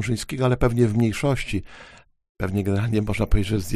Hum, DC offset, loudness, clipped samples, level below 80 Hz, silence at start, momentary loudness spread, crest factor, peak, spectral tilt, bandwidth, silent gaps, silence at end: none; under 0.1%; -23 LUFS; under 0.1%; -32 dBFS; 0 s; 9 LU; 18 dB; -4 dBFS; -6.5 dB/octave; 15.5 kHz; 2.29-2.35 s; 0 s